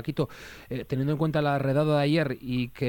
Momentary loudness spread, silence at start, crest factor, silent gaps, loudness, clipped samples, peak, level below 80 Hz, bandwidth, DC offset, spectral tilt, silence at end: 12 LU; 0 s; 14 dB; none; -27 LUFS; under 0.1%; -12 dBFS; -56 dBFS; 17.5 kHz; under 0.1%; -7.5 dB/octave; 0 s